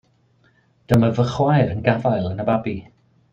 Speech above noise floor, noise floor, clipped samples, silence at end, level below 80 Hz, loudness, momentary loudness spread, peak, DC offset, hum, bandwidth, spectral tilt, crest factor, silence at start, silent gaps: 41 dB; -59 dBFS; under 0.1%; 0.5 s; -48 dBFS; -20 LUFS; 5 LU; -2 dBFS; under 0.1%; none; 15.5 kHz; -8 dB/octave; 18 dB; 0.9 s; none